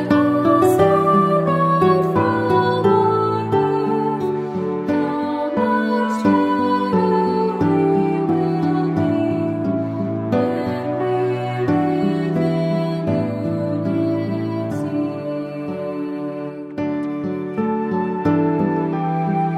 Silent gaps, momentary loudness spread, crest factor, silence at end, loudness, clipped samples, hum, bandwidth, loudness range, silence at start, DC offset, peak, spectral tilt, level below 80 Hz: none; 9 LU; 16 dB; 0 s; -19 LUFS; under 0.1%; none; 15 kHz; 7 LU; 0 s; under 0.1%; -4 dBFS; -8.5 dB/octave; -56 dBFS